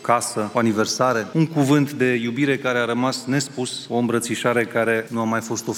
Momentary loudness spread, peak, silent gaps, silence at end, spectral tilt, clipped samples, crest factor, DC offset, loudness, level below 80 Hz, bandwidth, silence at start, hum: 5 LU; -2 dBFS; none; 0 s; -5 dB/octave; under 0.1%; 18 dB; under 0.1%; -21 LUFS; -68 dBFS; 17 kHz; 0 s; none